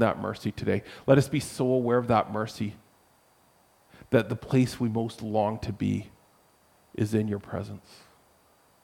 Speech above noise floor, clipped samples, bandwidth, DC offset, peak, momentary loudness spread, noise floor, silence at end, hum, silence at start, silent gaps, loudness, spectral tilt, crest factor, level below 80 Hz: 36 dB; under 0.1%; 16.5 kHz; under 0.1%; -8 dBFS; 13 LU; -63 dBFS; 1.05 s; none; 0 s; none; -28 LUFS; -7 dB/octave; 22 dB; -58 dBFS